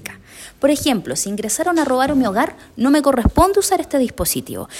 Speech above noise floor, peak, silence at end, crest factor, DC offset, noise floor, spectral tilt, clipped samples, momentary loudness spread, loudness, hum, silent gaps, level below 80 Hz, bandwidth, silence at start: 22 dB; -2 dBFS; 0 s; 16 dB; under 0.1%; -39 dBFS; -4 dB/octave; under 0.1%; 8 LU; -17 LUFS; none; none; -34 dBFS; 16.5 kHz; 0.05 s